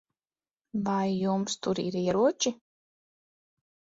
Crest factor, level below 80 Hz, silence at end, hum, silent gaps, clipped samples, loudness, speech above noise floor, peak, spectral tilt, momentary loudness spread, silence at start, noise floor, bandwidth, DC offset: 18 dB; -68 dBFS; 1.45 s; none; none; under 0.1%; -29 LUFS; over 62 dB; -12 dBFS; -5 dB/octave; 8 LU; 0.75 s; under -90 dBFS; 8 kHz; under 0.1%